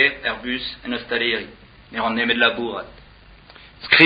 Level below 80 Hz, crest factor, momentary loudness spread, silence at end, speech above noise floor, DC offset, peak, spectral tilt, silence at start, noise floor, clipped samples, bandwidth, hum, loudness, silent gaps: -50 dBFS; 22 dB; 16 LU; 0 s; 23 dB; under 0.1%; 0 dBFS; -6.5 dB/octave; 0 s; -47 dBFS; under 0.1%; 5.2 kHz; none; -21 LUFS; none